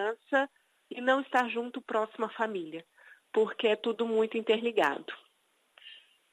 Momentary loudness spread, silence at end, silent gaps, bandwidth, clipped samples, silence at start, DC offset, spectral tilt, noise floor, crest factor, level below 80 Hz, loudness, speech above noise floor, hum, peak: 17 LU; 0.35 s; none; 10.5 kHz; under 0.1%; 0 s; under 0.1%; -4.5 dB/octave; -72 dBFS; 18 dB; -90 dBFS; -30 LUFS; 42 dB; none; -12 dBFS